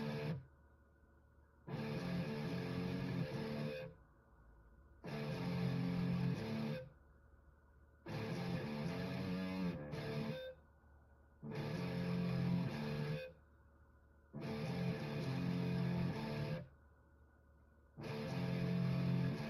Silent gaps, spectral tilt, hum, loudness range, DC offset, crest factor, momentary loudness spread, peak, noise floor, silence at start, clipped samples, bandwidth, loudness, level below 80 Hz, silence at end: none; -7.5 dB/octave; none; 2 LU; under 0.1%; 16 dB; 11 LU; -28 dBFS; -68 dBFS; 0 s; under 0.1%; 13 kHz; -42 LUFS; -64 dBFS; 0 s